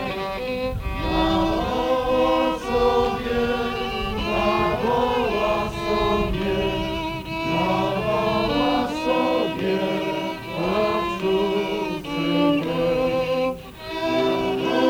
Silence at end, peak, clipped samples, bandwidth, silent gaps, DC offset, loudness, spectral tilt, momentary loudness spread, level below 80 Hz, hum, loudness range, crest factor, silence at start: 0 s; -8 dBFS; under 0.1%; 17 kHz; none; under 0.1%; -23 LUFS; -6 dB/octave; 7 LU; -38 dBFS; none; 1 LU; 14 dB; 0 s